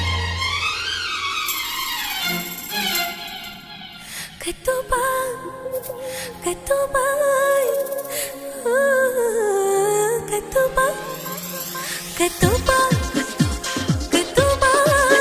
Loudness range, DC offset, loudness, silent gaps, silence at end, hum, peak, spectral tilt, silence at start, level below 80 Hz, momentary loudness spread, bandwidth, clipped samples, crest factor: 5 LU; under 0.1%; -21 LUFS; none; 0 s; none; -2 dBFS; -3.5 dB/octave; 0 s; -36 dBFS; 12 LU; 16 kHz; under 0.1%; 20 dB